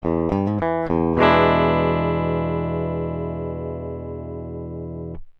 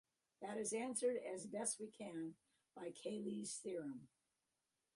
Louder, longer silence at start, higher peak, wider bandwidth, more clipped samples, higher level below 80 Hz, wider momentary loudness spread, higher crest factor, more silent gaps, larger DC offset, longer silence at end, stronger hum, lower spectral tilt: first, -21 LUFS vs -46 LUFS; second, 0 s vs 0.4 s; first, -2 dBFS vs -28 dBFS; second, 6 kHz vs 11.5 kHz; neither; first, -38 dBFS vs -90 dBFS; first, 16 LU vs 12 LU; about the same, 20 dB vs 20 dB; neither; neither; second, 0.1 s vs 0.9 s; neither; first, -9 dB/octave vs -3.5 dB/octave